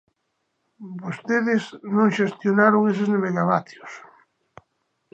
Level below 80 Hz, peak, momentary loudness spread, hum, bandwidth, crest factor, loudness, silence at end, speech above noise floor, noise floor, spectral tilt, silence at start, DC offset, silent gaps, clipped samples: -74 dBFS; -2 dBFS; 22 LU; none; 8 kHz; 20 dB; -21 LUFS; 1.15 s; 53 dB; -75 dBFS; -7 dB/octave; 0.8 s; under 0.1%; none; under 0.1%